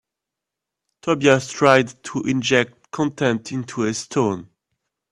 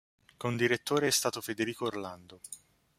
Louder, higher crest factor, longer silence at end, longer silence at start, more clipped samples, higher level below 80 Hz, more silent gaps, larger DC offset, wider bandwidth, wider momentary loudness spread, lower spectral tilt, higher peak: first, -20 LUFS vs -31 LUFS; about the same, 22 dB vs 20 dB; first, 0.65 s vs 0.4 s; first, 1.05 s vs 0.4 s; neither; first, -60 dBFS vs -72 dBFS; neither; neither; second, 11.5 kHz vs 16 kHz; second, 11 LU vs 19 LU; first, -5 dB/octave vs -3.5 dB/octave; first, 0 dBFS vs -12 dBFS